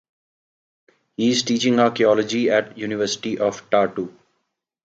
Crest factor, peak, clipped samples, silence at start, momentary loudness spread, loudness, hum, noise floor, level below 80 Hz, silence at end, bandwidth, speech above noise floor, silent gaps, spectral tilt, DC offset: 18 dB; -4 dBFS; under 0.1%; 1.2 s; 10 LU; -20 LUFS; none; -75 dBFS; -66 dBFS; 0.8 s; 8 kHz; 55 dB; none; -4 dB/octave; under 0.1%